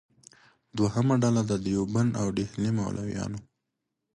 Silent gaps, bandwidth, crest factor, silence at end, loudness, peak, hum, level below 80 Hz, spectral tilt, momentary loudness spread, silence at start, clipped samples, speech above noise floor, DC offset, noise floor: none; 11.5 kHz; 16 dB; 0.75 s; -28 LUFS; -12 dBFS; none; -54 dBFS; -7 dB/octave; 10 LU; 0.75 s; under 0.1%; 56 dB; under 0.1%; -83 dBFS